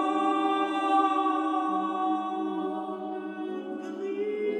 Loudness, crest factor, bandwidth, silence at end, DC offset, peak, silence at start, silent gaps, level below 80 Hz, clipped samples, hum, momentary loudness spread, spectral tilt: -29 LUFS; 16 dB; 8.8 kHz; 0 s; under 0.1%; -14 dBFS; 0 s; none; -86 dBFS; under 0.1%; none; 11 LU; -5.5 dB/octave